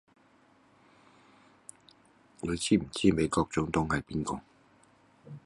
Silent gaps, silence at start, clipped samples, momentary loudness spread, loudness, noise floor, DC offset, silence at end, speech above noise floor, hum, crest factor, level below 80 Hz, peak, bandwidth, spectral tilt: none; 2.45 s; under 0.1%; 25 LU; -30 LUFS; -63 dBFS; under 0.1%; 0.05 s; 34 dB; none; 24 dB; -52 dBFS; -10 dBFS; 11.5 kHz; -5 dB/octave